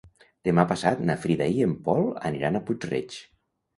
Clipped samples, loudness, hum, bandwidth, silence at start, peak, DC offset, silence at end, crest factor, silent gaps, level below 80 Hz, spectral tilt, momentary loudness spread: under 0.1%; -26 LUFS; none; 11.5 kHz; 0.05 s; -4 dBFS; under 0.1%; 0.55 s; 22 dB; none; -56 dBFS; -7 dB/octave; 9 LU